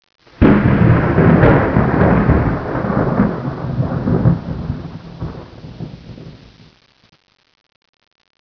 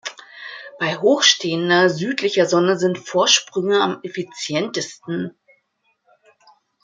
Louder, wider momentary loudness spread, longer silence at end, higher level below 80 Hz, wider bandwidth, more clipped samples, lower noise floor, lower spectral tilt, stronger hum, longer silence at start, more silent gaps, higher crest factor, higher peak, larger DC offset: first, -14 LUFS vs -18 LUFS; first, 21 LU vs 17 LU; first, 2.05 s vs 1.55 s; first, -28 dBFS vs -70 dBFS; second, 5.4 kHz vs 9.4 kHz; neither; second, -42 dBFS vs -67 dBFS; first, -10.5 dB/octave vs -3 dB/octave; neither; first, 0.4 s vs 0.05 s; neither; about the same, 16 dB vs 20 dB; about the same, 0 dBFS vs 0 dBFS; neither